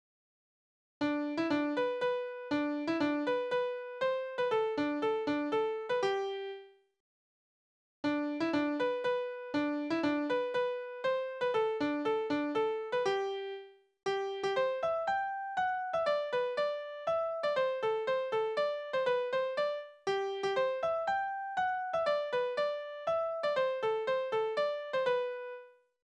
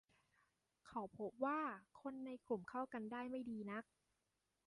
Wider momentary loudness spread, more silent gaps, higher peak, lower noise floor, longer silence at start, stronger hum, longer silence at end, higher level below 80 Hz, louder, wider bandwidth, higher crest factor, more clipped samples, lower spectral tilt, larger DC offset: second, 4 LU vs 10 LU; first, 7.00-8.03 s vs none; first, -20 dBFS vs -28 dBFS; about the same, under -90 dBFS vs -88 dBFS; first, 1 s vs 0.85 s; neither; second, 0.35 s vs 0.85 s; first, -76 dBFS vs -84 dBFS; first, -33 LUFS vs -48 LUFS; second, 9.2 kHz vs 11 kHz; second, 14 dB vs 20 dB; neither; second, -5 dB/octave vs -7 dB/octave; neither